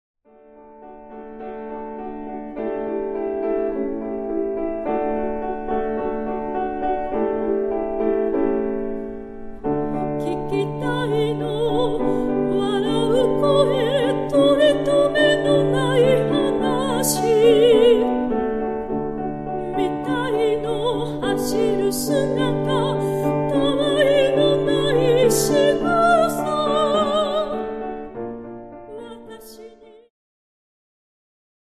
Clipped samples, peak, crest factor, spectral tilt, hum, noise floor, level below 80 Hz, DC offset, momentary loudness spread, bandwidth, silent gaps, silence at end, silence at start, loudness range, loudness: under 0.1%; -4 dBFS; 16 dB; -5 dB/octave; none; -48 dBFS; -44 dBFS; under 0.1%; 15 LU; 14.5 kHz; none; 2.05 s; 0.55 s; 9 LU; -20 LUFS